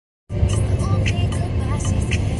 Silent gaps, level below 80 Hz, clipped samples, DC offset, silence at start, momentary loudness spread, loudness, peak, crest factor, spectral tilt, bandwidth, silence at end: none; -26 dBFS; under 0.1%; under 0.1%; 0.3 s; 3 LU; -21 LUFS; -6 dBFS; 14 dB; -6 dB/octave; 11.5 kHz; 0 s